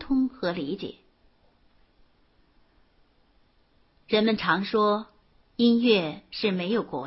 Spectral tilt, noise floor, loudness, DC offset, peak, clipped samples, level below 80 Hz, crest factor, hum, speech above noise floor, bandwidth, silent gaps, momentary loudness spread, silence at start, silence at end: -9.5 dB/octave; -63 dBFS; -25 LUFS; under 0.1%; -8 dBFS; under 0.1%; -58 dBFS; 20 dB; none; 39 dB; 5.8 kHz; none; 13 LU; 0 s; 0 s